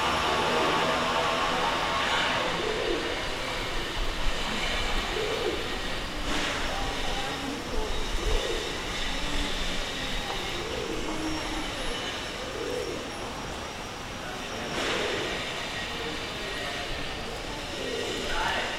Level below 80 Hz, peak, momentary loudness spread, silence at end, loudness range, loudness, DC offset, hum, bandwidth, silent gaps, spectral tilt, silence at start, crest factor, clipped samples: -38 dBFS; -14 dBFS; 9 LU; 0 s; 5 LU; -29 LUFS; under 0.1%; none; 16 kHz; none; -3 dB/octave; 0 s; 16 dB; under 0.1%